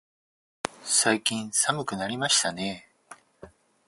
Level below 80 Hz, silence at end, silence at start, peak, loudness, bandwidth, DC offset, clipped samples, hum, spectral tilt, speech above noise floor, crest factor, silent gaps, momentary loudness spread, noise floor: -66 dBFS; 0.4 s; 0.65 s; -4 dBFS; -25 LUFS; 12 kHz; under 0.1%; under 0.1%; none; -1.5 dB/octave; 26 dB; 26 dB; none; 14 LU; -52 dBFS